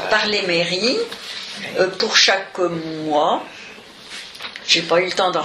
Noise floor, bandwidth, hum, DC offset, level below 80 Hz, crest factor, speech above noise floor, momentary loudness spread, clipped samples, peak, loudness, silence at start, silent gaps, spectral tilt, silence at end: -39 dBFS; 15 kHz; none; under 0.1%; -62 dBFS; 20 dB; 20 dB; 19 LU; under 0.1%; 0 dBFS; -18 LUFS; 0 s; none; -2.5 dB/octave; 0 s